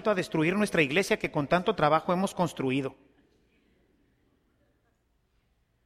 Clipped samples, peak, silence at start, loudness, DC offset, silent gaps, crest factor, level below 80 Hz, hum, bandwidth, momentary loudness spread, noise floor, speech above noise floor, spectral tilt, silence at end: under 0.1%; -10 dBFS; 0 s; -27 LUFS; under 0.1%; none; 20 dB; -60 dBFS; none; 15 kHz; 5 LU; -72 dBFS; 45 dB; -5.5 dB/octave; 2.95 s